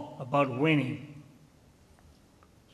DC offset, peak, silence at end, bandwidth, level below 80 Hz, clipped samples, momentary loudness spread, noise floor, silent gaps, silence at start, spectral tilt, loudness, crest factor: under 0.1%; -12 dBFS; 1.5 s; 12 kHz; -66 dBFS; under 0.1%; 22 LU; -60 dBFS; none; 0 s; -7.5 dB/octave; -29 LUFS; 20 dB